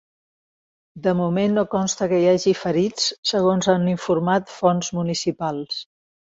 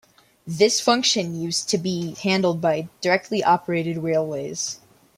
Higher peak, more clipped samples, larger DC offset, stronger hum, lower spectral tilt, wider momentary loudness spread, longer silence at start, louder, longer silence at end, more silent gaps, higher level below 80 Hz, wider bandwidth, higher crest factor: about the same, -4 dBFS vs -4 dBFS; neither; neither; neither; first, -5 dB/octave vs -3.5 dB/octave; about the same, 8 LU vs 9 LU; first, 0.95 s vs 0.45 s; about the same, -21 LUFS vs -22 LUFS; about the same, 0.4 s vs 0.4 s; first, 3.18-3.23 s vs none; first, -58 dBFS vs -64 dBFS; second, 8 kHz vs 16 kHz; about the same, 18 dB vs 20 dB